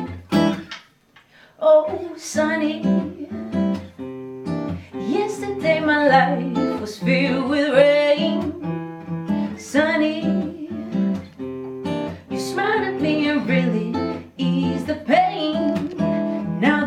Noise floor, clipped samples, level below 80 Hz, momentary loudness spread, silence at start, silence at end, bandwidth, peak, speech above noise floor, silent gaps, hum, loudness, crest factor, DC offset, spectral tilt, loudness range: -54 dBFS; under 0.1%; -62 dBFS; 14 LU; 0 s; 0 s; 13.5 kHz; -2 dBFS; 36 dB; none; none; -21 LUFS; 18 dB; under 0.1%; -6 dB/octave; 6 LU